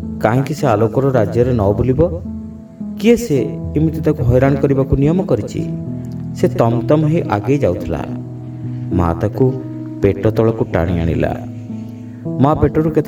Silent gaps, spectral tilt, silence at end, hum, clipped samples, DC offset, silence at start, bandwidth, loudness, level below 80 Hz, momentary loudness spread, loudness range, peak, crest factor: none; -8.5 dB/octave; 0 s; none; under 0.1%; under 0.1%; 0 s; 18 kHz; -16 LUFS; -34 dBFS; 13 LU; 2 LU; 0 dBFS; 16 dB